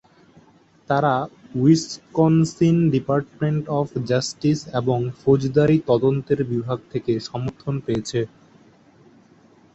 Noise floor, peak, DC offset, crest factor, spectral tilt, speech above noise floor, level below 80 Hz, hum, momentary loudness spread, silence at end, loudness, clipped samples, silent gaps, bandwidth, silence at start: -54 dBFS; -4 dBFS; under 0.1%; 18 dB; -7 dB/octave; 34 dB; -54 dBFS; none; 9 LU; 1.5 s; -21 LUFS; under 0.1%; none; 8.2 kHz; 0.9 s